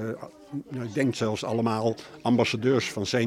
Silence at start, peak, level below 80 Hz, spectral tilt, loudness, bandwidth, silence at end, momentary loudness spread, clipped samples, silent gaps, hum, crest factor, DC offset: 0 s; -10 dBFS; -66 dBFS; -5.5 dB/octave; -27 LUFS; 15 kHz; 0 s; 13 LU; under 0.1%; none; none; 18 dB; under 0.1%